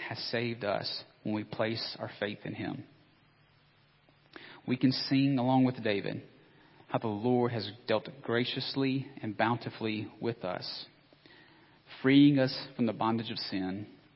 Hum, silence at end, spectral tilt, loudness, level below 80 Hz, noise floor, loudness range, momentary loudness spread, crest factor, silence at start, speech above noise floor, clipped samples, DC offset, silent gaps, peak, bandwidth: none; 0.2 s; -10 dB/octave; -31 LUFS; -70 dBFS; -65 dBFS; 7 LU; 13 LU; 20 dB; 0 s; 34 dB; under 0.1%; under 0.1%; none; -12 dBFS; 5.8 kHz